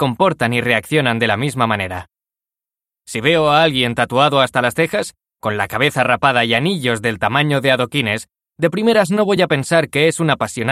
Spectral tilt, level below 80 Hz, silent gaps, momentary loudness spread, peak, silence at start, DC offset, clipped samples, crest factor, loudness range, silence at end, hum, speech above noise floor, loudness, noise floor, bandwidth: -5 dB/octave; -52 dBFS; none; 7 LU; 0 dBFS; 0 s; under 0.1%; under 0.1%; 16 dB; 2 LU; 0 s; none; 73 dB; -16 LUFS; -89 dBFS; 16 kHz